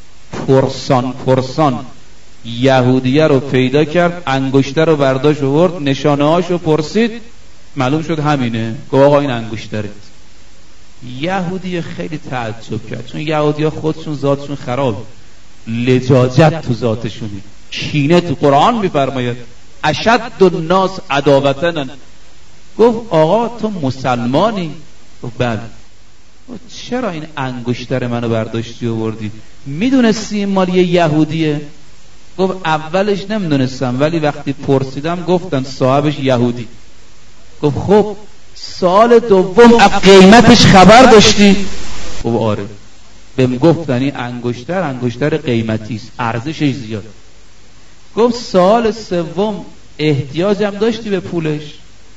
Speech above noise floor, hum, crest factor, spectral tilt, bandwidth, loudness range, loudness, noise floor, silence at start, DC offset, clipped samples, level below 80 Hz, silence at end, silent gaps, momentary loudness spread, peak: 33 dB; none; 14 dB; -6 dB/octave; 11 kHz; 12 LU; -13 LUFS; -46 dBFS; 0 s; 4%; 0.9%; -38 dBFS; 0 s; none; 16 LU; 0 dBFS